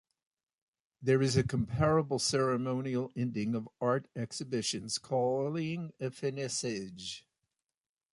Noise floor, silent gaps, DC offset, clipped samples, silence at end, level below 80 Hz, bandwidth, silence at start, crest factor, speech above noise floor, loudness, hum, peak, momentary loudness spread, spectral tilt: -87 dBFS; none; under 0.1%; under 0.1%; 0.95 s; -60 dBFS; 11.5 kHz; 1 s; 18 dB; 55 dB; -33 LUFS; none; -16 dBFS; 11 LU; -5 dB/octave